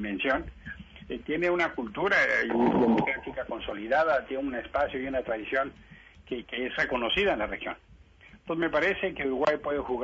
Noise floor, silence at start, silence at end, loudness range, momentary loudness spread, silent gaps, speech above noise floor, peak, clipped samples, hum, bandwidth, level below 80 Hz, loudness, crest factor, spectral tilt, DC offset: -55 dBFS; 0 s; 0 s; 4 LU; 14 LU; none; 26 dB; -14 dBFS; under 0.1%; none; 8 kHz; -52 dBFS; -28 LUFS; 14 dB; -5.5 dB/octave; under 0.1%